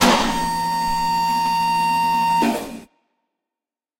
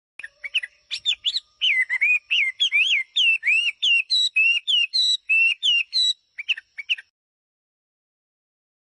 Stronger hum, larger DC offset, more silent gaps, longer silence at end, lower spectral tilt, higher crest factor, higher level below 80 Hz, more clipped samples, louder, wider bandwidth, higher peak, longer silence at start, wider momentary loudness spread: neither; neither; neither; second, 1.15 s vs 1.85 s; first, -3.5 dB/octave vs 6 dB/octave; first, 18 dB vs 12 dB; first, -42 dBFS vs -78 dBFS; neither; about the same, -19 LUFS vs -19 LUFS; first, 16 kHz vs 10.5 kHz; first, -2 dBFS vs -12 dBFS; second, 0 s vs 0.25 s; second, 6 LU vs 10 LU